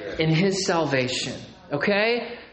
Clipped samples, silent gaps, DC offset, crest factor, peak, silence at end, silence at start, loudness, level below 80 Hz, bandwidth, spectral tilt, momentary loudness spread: under 0.1%; none; under 0.1%; 16 dB; -8 dBFS; 0.05 s; 0 s; -23 LUFS; -54 dBFS; 8.8 kHz; -4.5 dB/octave; 10 LU